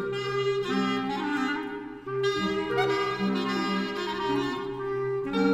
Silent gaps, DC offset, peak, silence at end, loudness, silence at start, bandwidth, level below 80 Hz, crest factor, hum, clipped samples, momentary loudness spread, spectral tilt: none; under 0.1%; -12 dBFS; 0 s; -28 LUFS; 0 s; 14 kHz; -58 dBFS; 16 dB; none; under 0.1%; 5 LU; -5.5 dB/octave